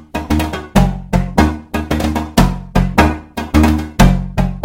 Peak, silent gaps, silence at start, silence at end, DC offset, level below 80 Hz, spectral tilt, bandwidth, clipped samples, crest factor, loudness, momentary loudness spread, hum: 0 dBFS; none; 0.15 s; 0 s; under 0.1%; -20 dBFS; -6 dB/octave; 17 kHz; 0.2%; 14 dB; -15 LUFS; 6 LU; none